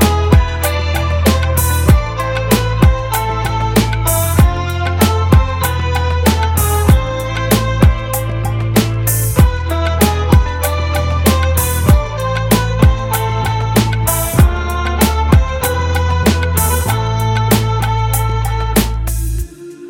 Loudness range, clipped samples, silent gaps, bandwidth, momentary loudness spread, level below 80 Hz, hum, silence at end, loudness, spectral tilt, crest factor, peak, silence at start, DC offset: 1 LU; under 0.1%; none; over 20 kHz; 6 LU; -18 dBFS; none; 0 s; -14 LUFS; -5.5 dB/octave; 12 dB; 0 dBFS; 0 s; under 0.1%